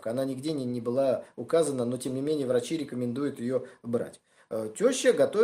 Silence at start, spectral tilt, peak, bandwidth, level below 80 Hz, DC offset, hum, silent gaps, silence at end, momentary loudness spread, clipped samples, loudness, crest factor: 0 s; -5 dB/octave; -10 dBFS; 15.5 kHz; -74 dBFS; under 0.1%; none; none; 0 s; 9 LU; under 0.1%; -29 LUFS; 18 dB